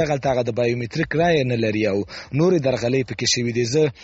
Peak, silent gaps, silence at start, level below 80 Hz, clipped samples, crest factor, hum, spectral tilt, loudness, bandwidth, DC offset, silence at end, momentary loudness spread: -6 dBFS; none; 0 s; -48 dBFS; under 0.1%; 14 dB; none; -5 dB/octave; -21 LUFS; 8 kHz; under 0.1%; 0 s; 5 LU